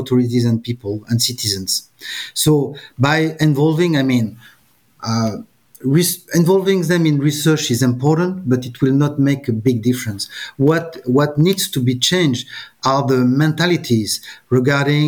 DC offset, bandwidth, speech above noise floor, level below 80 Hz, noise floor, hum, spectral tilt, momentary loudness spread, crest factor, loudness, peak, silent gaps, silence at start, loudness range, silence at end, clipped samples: under 0.1%; 19.5 kHz; 23 dB; -54 dBFS; -39 dBFS; none; -5 dB/octave; 9 LU; 14 dB; -17 LUFS; -4 dBFS; none; 0 s; 2 LU; 0 s; under 0.1%